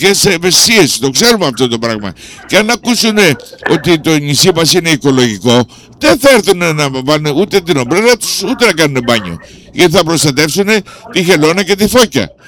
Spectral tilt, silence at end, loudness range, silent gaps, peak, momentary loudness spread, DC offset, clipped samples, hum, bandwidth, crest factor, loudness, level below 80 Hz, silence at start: -3.5 dB/octave; 0.2 s; 2 LU; none; 0 dBFS; 7 LU; under 0.1%; 0.3%; none; 19.5 kHz; 10 dB; -9 LUFS; -40 dBFS; 0 s